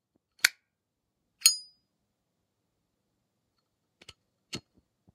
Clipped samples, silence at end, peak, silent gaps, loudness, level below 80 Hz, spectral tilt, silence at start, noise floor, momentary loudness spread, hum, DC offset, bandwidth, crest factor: under 0.1%; 0.55 s; -2 dBFS; none; -26 LUFS; -80 dBFS; 2 dB/octave; 0.45 s; -83 dBFS; 19 LU; none; under 0.1%; 15.5 kHz; 34 dB